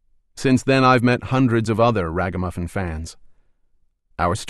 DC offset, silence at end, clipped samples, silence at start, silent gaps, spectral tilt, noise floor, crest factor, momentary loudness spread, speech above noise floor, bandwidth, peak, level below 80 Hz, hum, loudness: under 0.1%; 0 s; under 0.1%; 0.35 s; none; -6.5 dB/octave; -61 dBFS; 16 dB; 13 LU; 42 dB; 12.5 kHz; -4 dBFS; -42 dBFS; none; -19 LUFS